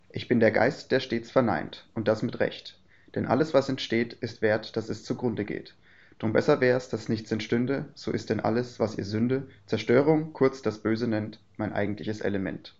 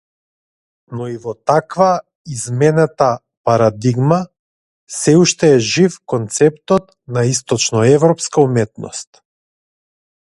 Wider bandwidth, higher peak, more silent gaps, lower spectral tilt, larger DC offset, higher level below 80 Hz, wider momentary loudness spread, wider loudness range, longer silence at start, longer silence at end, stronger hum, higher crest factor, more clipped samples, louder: second, 7.8 kHz vs 11.5 kHz; second, -6 dBFS vs 0 dBFS; second, none vs 2.15-2.25 s, 3.37-3.44 s, 4.39-4.87 s; about the same, -5.5 dB/octave vs -5 dB/octave; first, 0.2% vs under 0.1%; second, -62 dBFS vs -54 dBFS; second, 11 LU vs 14 LU; about the same, 2 LU vs 3 LU; second, 0.15 s vs 0.9 s; second, 0.1 s vs 1.2 s; neither; about the same, 20 dB vs 16 dB; neither; second, -27 LUFS vs -15 LUFS